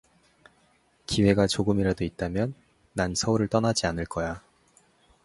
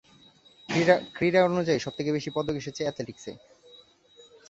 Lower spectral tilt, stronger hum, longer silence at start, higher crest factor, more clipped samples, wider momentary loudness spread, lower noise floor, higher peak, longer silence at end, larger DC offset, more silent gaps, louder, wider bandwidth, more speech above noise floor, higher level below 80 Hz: about the same, -5 dB/octave vs -5.5 dB/octave; neither; first, 1.1 s vs 0.7 s; about the same, 22 dB vs 22 dB; neither; second, 11 LU vs 15 LU; first, -64 dBFS vs -57 dBFS; about the same, -6 dBFS vs -6 dBFS; second, 0.85 s vs 1.1 s; neither; neither; about the same, -26 LUFS vs -26 LUFS; first, 11.5 kHz vs 8 kHz; first, 39 dB vs 31 dB; first, -46 dBFS vs -62 dBFS